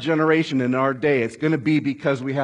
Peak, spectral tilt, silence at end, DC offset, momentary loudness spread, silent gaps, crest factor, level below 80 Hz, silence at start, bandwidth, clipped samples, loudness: -6 dBFS; -7 dB/octave; 0 s; under 0.1%; 4 LU; none; 14 dB; -66 dBFS; 0 s; 10 kHz; under 0.1%; -21 LUFS